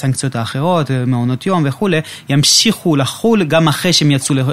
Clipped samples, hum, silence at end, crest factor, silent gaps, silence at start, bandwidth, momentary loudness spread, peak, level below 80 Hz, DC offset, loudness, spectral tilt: under 0.1%; none; 0 s; 14 dB; none; 0 s; 16 kHz; 8 LU; 0 dBFS; -50 dBFS; under 0.1%; -13 LUFS; -4.5 dB/octave